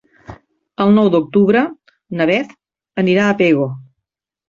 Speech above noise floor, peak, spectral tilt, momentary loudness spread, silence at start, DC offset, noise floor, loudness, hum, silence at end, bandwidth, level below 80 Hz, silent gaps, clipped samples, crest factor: 65 dB; -2 dBFS; -7.5 dB/octave; 16 LU; 0.3 s; under 0.1%; -78 dBFS; -15 LUFS; none; 0.7 s; 7.2 kHz; -54 dBFS; none; under 0.1%; 14 dB